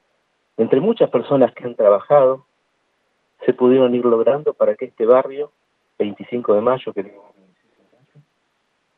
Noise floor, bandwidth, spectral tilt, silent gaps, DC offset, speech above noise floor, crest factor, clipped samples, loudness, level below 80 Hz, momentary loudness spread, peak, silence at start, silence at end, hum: -68 dBFS; 4.1 kHz; -10 dB/octave; none; under 0.1%; 51 dB; 18 dB; under 0.1%; -17 LUFS; -76 dBFS; 14 LU; 0 dBFS; 0.6 s; 1.9 s; none